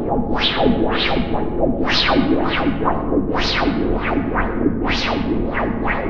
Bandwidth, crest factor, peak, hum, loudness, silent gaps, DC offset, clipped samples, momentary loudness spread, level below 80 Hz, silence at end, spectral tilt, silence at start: 7.2 kHz; 16 dB; -2 dBFS; none; -19 LUFS; none; under 0.1%; under 0.1%; 5 LU; -28 dBFS; 0 s; -6 dB/octave; 0 s